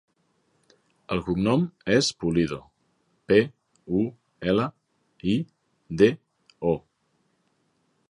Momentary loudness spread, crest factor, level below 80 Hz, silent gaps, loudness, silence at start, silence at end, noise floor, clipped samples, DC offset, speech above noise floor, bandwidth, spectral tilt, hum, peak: 11 LU; 22 dB; -54 dBFS; none; -25 LUFS; 1.1 s; 1.3 s; -71 dBFS; under 0.1%; under 0.1%; 47 dB; 11.5 kHz; -6 dB/octave; none; -4 dBFS